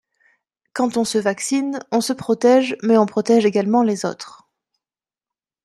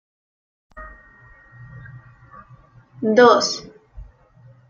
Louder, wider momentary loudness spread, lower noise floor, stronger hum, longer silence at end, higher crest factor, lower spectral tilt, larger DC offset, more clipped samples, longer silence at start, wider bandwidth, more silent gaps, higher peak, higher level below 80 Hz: about the same, -18 LUFS vs -16 LUFS; second, 10 LU vs 28 LU; first, under -90 dBFS vs -50 dBFS; neither; first, 1.35 s vs 0.65 s; about the same, 18 dB vs 22 dB; about the same, -4.5 dB/octave vs -3.5 dB/octave; neither; neither; about the same, 0.75 s vs 0.75 s; first, 13 kHz vs 7.4 kHz; neither; about the same, -2 dBFS vs -2 dBFS; second, -68 dBFS vs -50 dBFS